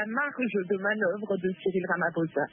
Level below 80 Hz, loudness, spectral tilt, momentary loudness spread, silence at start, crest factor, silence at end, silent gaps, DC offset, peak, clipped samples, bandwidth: -76 dBFS; -29 LUFS; -10.5 dB/octave; 3 LU; 0 s; 16 dB; 0.05 s; none; under 0.1%; -14 dBFS; under 0.1%; 3.6 kHz